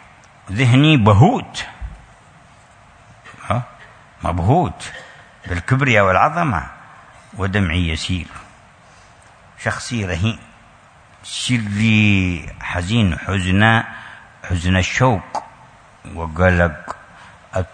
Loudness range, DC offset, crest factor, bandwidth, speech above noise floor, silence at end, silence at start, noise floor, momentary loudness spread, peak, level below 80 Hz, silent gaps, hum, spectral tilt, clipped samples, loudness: 7 LU; under 0.1%; 18 dB; 9.6 kHz; 31 dB; 0.1 s; 0.45 s; -47 dBFS; 22 LU; 0 dBFS; -38 dBFS; none; none; -6 dB/octave; under 0.1%; -17 LUFS